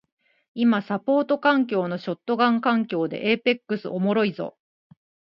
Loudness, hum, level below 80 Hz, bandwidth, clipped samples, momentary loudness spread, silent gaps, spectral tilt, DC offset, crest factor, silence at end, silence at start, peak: -23 LUFS; none; -72 dBFS; 5.8 kHz; under 0.1%; 9 LU; none; -8.5 dB/octave; under 0.1%; 18 dB; 0.9 s; 0.55 s; -6 dBFS